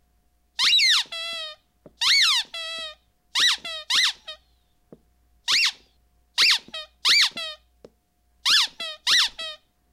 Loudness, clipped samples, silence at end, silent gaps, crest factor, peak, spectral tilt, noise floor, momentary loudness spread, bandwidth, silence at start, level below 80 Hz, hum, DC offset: -20 LUFS; under 0.1%; 0.35 s; none; 18 dB; -6 dBFS; 3 dB/octave; -66 dBFS; 18 LU; 16 kHz; 0.6 s; -66 dBFS; none; under 0.1%